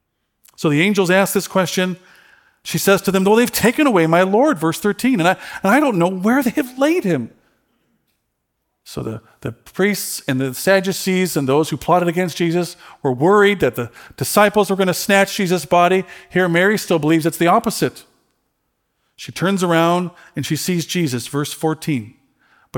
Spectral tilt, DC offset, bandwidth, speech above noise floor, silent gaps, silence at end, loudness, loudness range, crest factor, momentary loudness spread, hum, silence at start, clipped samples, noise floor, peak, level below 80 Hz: -5 dB/octave; under 0.1%; 19 kHz; 56 dB; none; 0 s; -17 LUFS; 6 LU; 18 dB; 12 LU; none; 0.6 s; under 0.1%; -73 dBFS; 0 dBFS; -56 dBFS